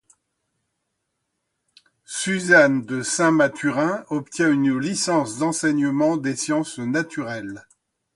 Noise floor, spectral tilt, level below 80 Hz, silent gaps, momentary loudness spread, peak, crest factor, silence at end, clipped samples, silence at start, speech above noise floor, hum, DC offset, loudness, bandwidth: -77 dBFS; -4.5 dB/octave; -66 dBFS; none; 13 LU; -2 dBFS; 20 dB; 0.55 s; under 0.1%; 2.1 s; 56 dB; none; under 0.1%; -21 LUFS; 11.5 kHz